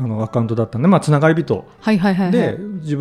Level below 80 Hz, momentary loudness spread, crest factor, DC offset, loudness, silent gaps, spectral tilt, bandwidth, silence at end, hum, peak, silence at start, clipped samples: -52 dBFS; 8 LU; 16 dB; under 0.1%; -17 LUFS; none; -8 dB/octave; 11.5 kHz; 0 s; none; 0 dBFS; 0 s; under 0.1%